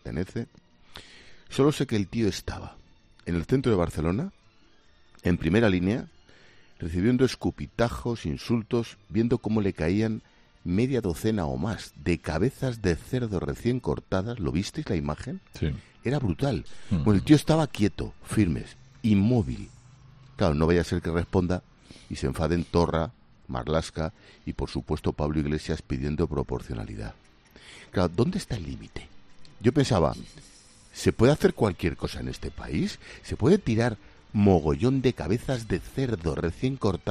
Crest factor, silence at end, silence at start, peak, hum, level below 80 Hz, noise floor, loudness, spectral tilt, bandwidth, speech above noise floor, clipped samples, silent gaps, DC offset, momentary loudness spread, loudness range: 22 dB; 0 s; 0.05 s; -4 dBFS; none; -44 dBFS; -57 dBFS; -27 LUFS; -7 dB/octave; 14 kHz; 31 dB; under 0.1%; none; under 0.1%; 15 LU; 5 LU